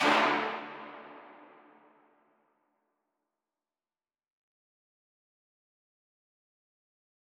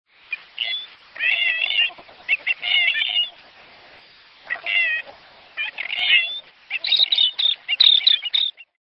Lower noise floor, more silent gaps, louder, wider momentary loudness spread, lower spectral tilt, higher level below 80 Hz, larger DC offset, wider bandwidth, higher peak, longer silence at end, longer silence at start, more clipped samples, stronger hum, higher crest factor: first, under -90 dBFS vs -49 dBFS; neither; second, -29 LUFS vs -18 LUFS; first, 26 LU vs 16 LU; first, -3 dB/octave vs 0.5 dB/octave; second, under -90 dBFS vs -70 dBFS; neither; first, 17.5 kHz vs 8.8 kHz; second, -14 dBFS vs -2 dBFS; first, 6.05 s vs 0.3 s; second, 0 s vs 0.3 s; neither; neither; about the same, 24 dB vs 20 dB